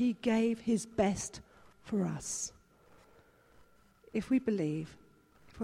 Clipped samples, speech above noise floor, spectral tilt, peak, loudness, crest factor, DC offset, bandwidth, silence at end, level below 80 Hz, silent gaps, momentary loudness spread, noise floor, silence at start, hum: under 0.1%; 31 dB; -5 dB/octave; -16 dBFS; -34 LUFS; 18 dB; under 0.1%; 13.5 kHz; 0 s; -62 dBFS; none; 11 LU; -63 dBFS; 0 s; none